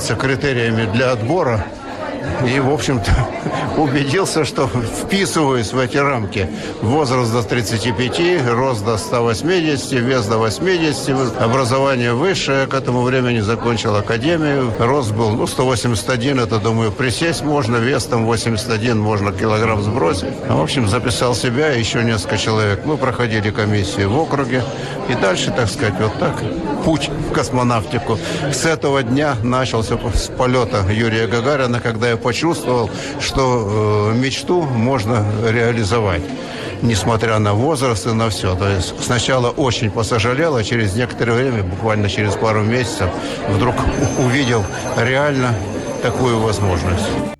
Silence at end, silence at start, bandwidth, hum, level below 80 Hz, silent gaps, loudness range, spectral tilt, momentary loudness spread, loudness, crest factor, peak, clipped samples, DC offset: 0.05 s; 0 s; 13 kHz; none; -36 dBFS; none; 1 LU; -5.5 dB/octave; 4 LU; -17 LUFS; 10 dB; -6 dBFS; under 0.1%; under 0.1%